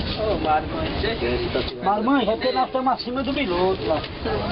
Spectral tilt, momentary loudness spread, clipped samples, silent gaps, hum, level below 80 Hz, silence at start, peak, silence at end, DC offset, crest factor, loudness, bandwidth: -10 dB/octave; 5 LU; under 0.1%; none; none; -38 dBFS; 0 s; -10 dBFS; 0 s; under 0.1%; 12 dB; -23 LUFS; 5.8 kHz